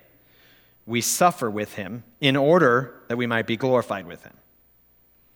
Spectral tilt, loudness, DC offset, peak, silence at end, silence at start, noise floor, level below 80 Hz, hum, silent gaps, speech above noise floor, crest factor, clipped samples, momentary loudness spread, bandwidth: -4 dB/octave; -22 LUFS; under 0.1%; -2 dBFS; 1.2 s; 0.85 s; -59 dBFS; -68 dBFS; 60 Hz at -50 dBFS; none; 37 dB; 22 dB; under 0.1%; 15 LU; 20 kHz